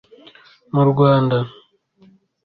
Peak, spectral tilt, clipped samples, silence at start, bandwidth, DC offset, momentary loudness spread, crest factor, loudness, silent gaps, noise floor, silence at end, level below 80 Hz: -4 dBFS; -11 dB/octave; under 0.1%; 0.75 s; 4.8 kHz; under 0.1%; 10 LU; 16 dB; -17 LUFS; none; -53 dBFS; 0.95 s; -56 dBFS